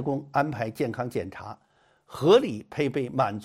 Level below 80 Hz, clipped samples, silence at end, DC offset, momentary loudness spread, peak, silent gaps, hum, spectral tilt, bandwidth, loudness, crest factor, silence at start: -64 dBFS; under 0.1%; 0 s; under 0.1%; 19 LU; -8 dBFS; none; none; -6.5 dB/octave; 15.5 kHz; -26 LUFS; 18 dB; 0 s